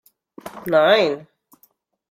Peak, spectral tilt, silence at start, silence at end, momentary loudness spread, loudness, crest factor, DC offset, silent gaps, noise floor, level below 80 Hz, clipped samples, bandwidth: -2 dBFS; -5 dB/octave; 0.45 s; 0.9 s; 23 LU; -17 LUFS; 18 dB; under 0.1%; none; -61 dBFS; -66 dBFS; under 0.1%; 15.5 kHz